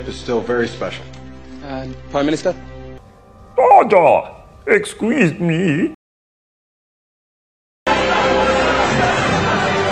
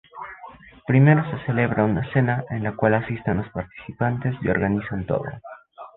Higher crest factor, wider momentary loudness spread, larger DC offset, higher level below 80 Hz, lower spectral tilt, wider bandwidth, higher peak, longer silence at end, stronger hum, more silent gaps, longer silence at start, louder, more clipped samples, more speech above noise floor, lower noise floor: about the same, 18 dB vs 18 dB; about the same, 19 LU vs 21 LU; neither; first, -40 dBFS vs -48 dBFS; second, -5.5 dB/octave vs -11.5 dB/octave; first, 12 kHz vs 4 kHz; first, 0 dBFS vs -4 dBFS; about the same, 0 s vs 0.1 s; neither; first, 5.94-7.86 s vs none; second, 0 s vs 0.15 s; first, -16 LUFS vs -22 LUFS; neither; first, 27 dB vs 22 dB; about the same, -43 dBFS vs -44 dBFS